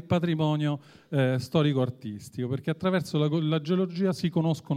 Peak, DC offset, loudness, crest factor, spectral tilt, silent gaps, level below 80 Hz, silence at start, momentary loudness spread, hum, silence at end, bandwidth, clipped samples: -10 dBFS; under 0.1%; -27 LUFS; 16 dB; -7.5 dB/octave; none; -64 dBFS; 0 s; 7 LU; none; 0 s; 14 kHz; under 0.1%